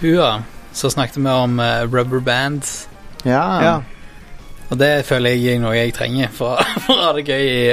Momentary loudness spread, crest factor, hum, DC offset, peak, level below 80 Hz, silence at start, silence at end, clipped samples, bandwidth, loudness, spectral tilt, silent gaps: 10 LU; 16 dB; none; under 0.1%; 0 dBFS; -38 dBFS; 0 s; 0 s; under 0.1%; 15.5 kHz; -17 LUFS; -5 dB/octave; none